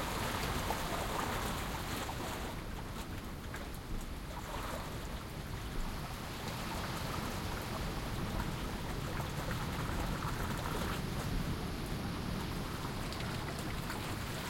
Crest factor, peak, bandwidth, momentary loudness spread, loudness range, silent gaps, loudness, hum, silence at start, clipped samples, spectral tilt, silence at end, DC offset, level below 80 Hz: 16 dB; -22 dBFS; 16.5 kHz; 7 LU; 4 LU; none; -40 LUFS; none; 0 s; under 0.1%; -4.5 dB/octave; 0 s; under 0.1%; -46 dBFS